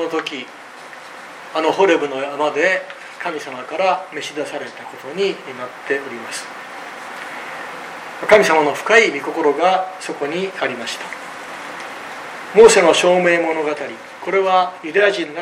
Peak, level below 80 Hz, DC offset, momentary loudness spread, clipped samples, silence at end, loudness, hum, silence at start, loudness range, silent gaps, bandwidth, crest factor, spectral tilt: 0 dBFS; -58 dBFS; under 0.1%; 18 LU; under 0.1%; 0 s; -17 LUFS; none; 0 s; 11 LU; none; 15 kHz; 18 dB; -3 dB/octave